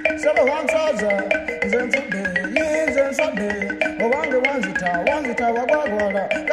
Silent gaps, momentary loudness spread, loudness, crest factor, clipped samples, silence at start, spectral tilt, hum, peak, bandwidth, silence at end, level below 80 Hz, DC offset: none; 4 LU; -20 LUFS; 18 dB; under 0.1%; 0 s; -4.5 dB/octave; none; -4 dBFS; 12.5 kHz; 0 s; -50 dBFS; under 0.1%